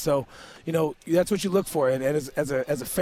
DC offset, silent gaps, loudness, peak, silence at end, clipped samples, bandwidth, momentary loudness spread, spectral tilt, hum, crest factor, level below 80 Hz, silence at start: under 0.1%; none; -26 LUFS; -10 dBFS; 0 s; under 0.1%; over 20 kHz; 5 LU; -5.5 dB/octave; none; 14 dB; -54 dBFS; 0 s